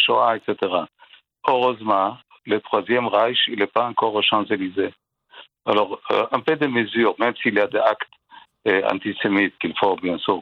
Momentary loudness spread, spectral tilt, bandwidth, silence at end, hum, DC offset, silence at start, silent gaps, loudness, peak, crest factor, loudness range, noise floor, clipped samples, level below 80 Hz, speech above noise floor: 7 LU; -6.5 dB/octave; 6.4 kHz; 0 s; none; under 0.1%; 0 s; none; -21 LUFS; 0 dBFS; 20 dB; 1 LU; -48 dBFS; under 0.1%; -70 dBFS; 27 dB